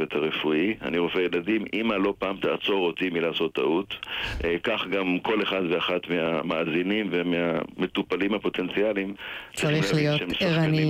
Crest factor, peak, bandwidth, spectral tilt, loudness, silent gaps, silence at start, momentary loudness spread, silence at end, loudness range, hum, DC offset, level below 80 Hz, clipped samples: 12 dB; -12 dBFS; 15.5 kHz; -6 dB/octave; -26 LUFS; none; 0 s; 4 LU; 0 s; 1 LU; none; under 0.1%; -50 dBFS; under 0.1%